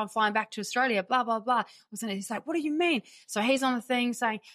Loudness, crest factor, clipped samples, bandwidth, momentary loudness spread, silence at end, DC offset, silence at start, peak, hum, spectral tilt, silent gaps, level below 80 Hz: -28 LUFS; 16 dB; under 0.1%; 15.5 kHz; 8 LU; 0.05 s; under 0.1%; 0 s; -12 dBFS; none; -3.5 dB/octave; none; -84 dBFS